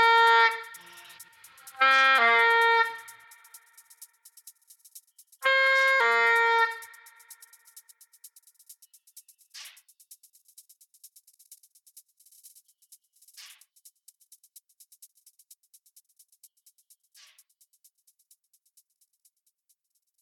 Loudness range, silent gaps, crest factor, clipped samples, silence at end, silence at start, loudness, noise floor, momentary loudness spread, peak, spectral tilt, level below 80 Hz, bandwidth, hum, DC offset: 6 LU; none; 20 dB; under 0.1%; 6.8 s; 0 s; -21 LUFS; -75 dBFS; 29 LU; -10 dBFS; 1.5 dB/octave; under -90 dBFS; 18 kHz; none; under 0.1%